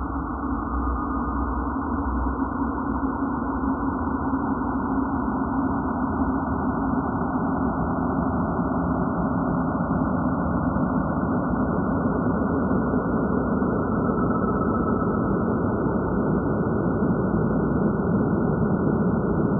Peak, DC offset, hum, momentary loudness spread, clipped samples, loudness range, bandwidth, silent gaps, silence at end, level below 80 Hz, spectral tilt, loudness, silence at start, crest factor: -10 dBFS; under 0.1%; none; 4 LU; under 0.1%; 3 LU; 1.6 kHz; none; 0 s; -36 dBFS; -6 dB/octave; -24 LUFS; 0 s; 14 dB